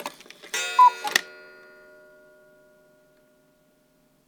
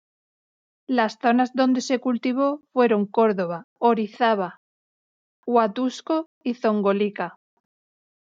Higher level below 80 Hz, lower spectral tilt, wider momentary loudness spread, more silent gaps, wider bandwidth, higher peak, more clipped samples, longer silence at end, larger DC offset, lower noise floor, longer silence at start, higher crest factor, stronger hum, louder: about the same, -78 dBFS vs -78 dBFS; second, 1 dB/octave vs -5.5 dB/octave; first, 27 LU vs 7 LU; second, none vs 3.64-3.76 s, 4.57-5.43 s, 6.26-6.41 s; first, over 20 kHz vs 7.6 kHz; first, -2 dBFS vs -6 dBFS; neither; first, 3 s vs 1 s; neither; second, -63 dBFS vs under -90 dBFS; second, 0 s vs 0.9 s; first, 26 dB vs 16 dB; neither; about the same, -21 LUFS vs -23 LUFS